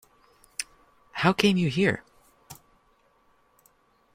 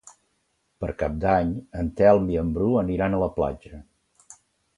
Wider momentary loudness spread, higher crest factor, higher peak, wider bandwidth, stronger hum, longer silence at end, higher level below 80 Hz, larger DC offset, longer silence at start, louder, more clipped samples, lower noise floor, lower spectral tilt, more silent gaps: first, 27 LU vs 12 LU; first, 26 dB vs 20 dB; about the same, -4 dBFS vs -4 dBFS; first, 16 kHz vs 11 kHz; neither; first, 1.6 s vs 0.45 s; second, -60 dBFS vs -40 dBFS; neither; first, 0.6 s vs 0.05 s; about the same, -25 LUFS vs -24 LUFS; neither; second, -65 dBFS vs -71 dBFS; second, -5 dB/octave vs -8.5 dB/octave; neither